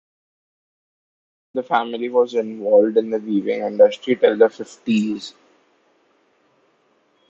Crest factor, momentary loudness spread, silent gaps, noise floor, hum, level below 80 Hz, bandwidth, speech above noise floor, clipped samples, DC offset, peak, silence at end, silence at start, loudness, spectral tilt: 20 dB; 14 LU; none; -62 dBFS; none; -72 dBFS; 7.6 kHz; 44 dB; under 0.1%; under 0.1%; -2 dBFS; 2 s; 1.55 s; -19 LUFS; -6 dB/octave